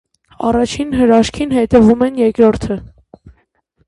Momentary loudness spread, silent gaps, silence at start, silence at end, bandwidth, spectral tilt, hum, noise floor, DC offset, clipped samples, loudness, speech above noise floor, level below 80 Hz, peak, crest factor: 11 LU; none; 0.4 s; 1 s; 11.5 kHz; -6 dB/octave; none; -59 dBFS; under 0.1%; under 0.1%; -13 LUFS; 47 dB; -36 dBFS; 0 dBFS; 14 dB